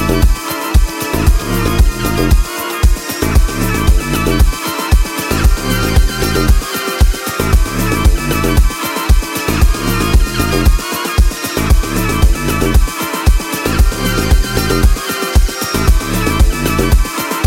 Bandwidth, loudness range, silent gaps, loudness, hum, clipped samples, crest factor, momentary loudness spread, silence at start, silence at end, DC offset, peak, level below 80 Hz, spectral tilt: 17 kHz; 1 LU; none; -14 LUFS; none; under 0.1%; 12 dB; 3 LU; 0 s; 0 s; under 0.1%; 0 dBFS; -14 dBFS; -5 dB/octave